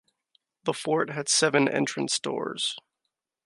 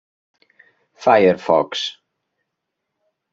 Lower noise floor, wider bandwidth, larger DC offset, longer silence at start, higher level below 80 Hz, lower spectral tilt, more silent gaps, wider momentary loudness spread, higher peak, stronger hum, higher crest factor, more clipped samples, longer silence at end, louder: first, -83 dBFS vs -79 dBFS; first, 11.5 kHz vs 7.8 kHz; neither; second, 0.65 s vs 1 s; second, -78 dBFS vs -68 dBFS; second, -3 dB/octave vs -5 dB/octave; neither; about the same, 10 LU vs 11 LU; second, -8 dBFS vs 0 dBFS; neither; about the same, 20 dB vs 20 dB; neither; second, 0.65 s vs 1.4 s; second, -26 LUFS vs -17 LUFS